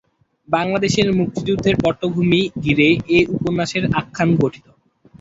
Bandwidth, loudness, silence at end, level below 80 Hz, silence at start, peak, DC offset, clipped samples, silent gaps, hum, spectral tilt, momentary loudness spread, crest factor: 8 kHz; -18 LUFS; 0.65 s; -44 dBFS; 0.5 s; -2 dBFS; under 0.1%; under 0.1%; none; none; -6 dB/octave; 6 LU; 16 dB